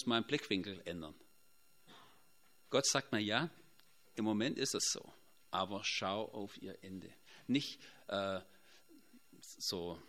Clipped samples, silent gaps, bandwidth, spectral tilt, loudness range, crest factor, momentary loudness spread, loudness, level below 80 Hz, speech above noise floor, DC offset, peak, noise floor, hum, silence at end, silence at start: under 0.1%; none; 16 kHz; -3 dB/octave; 5 LU; 24 dB; 16 LU; -38 LUFS; -78 dBFS; 33 dB; under 0.1%; -16 dBFS; -72 dBFS; none; 0.05 s; 0 s